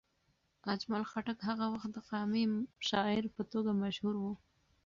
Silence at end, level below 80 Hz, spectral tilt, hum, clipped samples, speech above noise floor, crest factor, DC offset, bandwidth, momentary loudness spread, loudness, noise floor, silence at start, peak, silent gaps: 0.5 s; -70 dBFS; -4 dB/octave; none; under 0.1%; 41 dB; 18 dB; under 0.1%; 7.4 kHz; 7 LU; -37 LUFS; -77 dBFS; 0.65 s; -18 dBFS; none